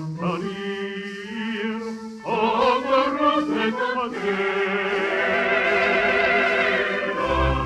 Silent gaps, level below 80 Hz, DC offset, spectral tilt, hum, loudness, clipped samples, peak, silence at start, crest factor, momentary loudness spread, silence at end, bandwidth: none; -40 dBFS; under 0.1%; -5.5 dB/octave; none; -22 LUFS; under 0.1%; -8 dBFS; 0 s; 16 dB; 11 LU; 0 s; 11.5 kHz